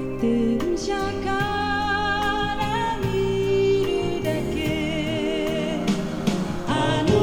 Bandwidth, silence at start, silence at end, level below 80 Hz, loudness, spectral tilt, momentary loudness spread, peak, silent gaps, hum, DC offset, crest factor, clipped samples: 18 kHz; 0 s; 0 s; -38 dBFS; -23 LUFS; -5.5 dB/octave; 4 LU; -6 dBFS; none; none; under 0.1%; 18 dB; under 0.1%